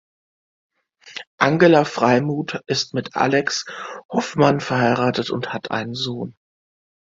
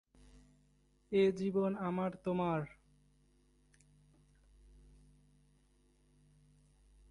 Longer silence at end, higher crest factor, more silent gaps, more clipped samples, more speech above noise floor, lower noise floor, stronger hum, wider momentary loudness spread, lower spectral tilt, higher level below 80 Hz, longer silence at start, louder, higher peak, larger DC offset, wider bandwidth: second, 0.9 s vs 4.45 s; about the same, 20 dB vs 20 dB; first, 1.27-1.38 s, 4.05-4.09 s vs none; neither; second, 21 dB vs 37 dB; second, -40 dBFS vs -71 dBFS; second, none vs 50 Hz at -65 dBFS; first, 16 LU vs 6 LU; second, -5 dB/octave vs -8 dB/octave; first, -60 dBFS vs -68 dBFS; first, 1.05 s vs 0.35 s; first, -20 LUFS vs -35 LUFS; first, 0 dBFS vs -20 dBFS; neither; second, 7.8 kHz vs 11 kHz